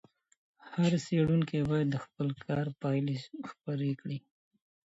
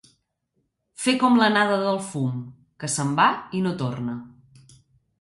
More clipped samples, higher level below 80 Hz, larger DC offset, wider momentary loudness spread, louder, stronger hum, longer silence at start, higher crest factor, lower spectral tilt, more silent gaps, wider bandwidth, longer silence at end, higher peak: neither; about the same, -62 dBFS vs -64 dBFS; neither; second, 12 LU vs 16 LU; second, -32 LUFS vs -22 LUFS; neither; second, 0.65 s vs 1 s; about the same, 16 dB vs 18 dB; first, -7.5 dB/octave vs -4.5 dB/octave; neither; second, 8 kHz vs 11.5 kHz; second, 0.75 s vs 0.9 s; second, -16 dBFS vs -6 dBFS